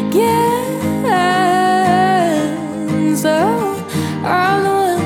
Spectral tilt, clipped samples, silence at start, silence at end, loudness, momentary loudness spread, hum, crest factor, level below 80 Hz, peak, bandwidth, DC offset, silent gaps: -5.5 dB/octave; under 0.1%; 0 s; 0 s; -15 LUFS; 7 LU; none; 14 dB; -56 dBFS; -2 dBFS; 18 kHz; under 0.1%; none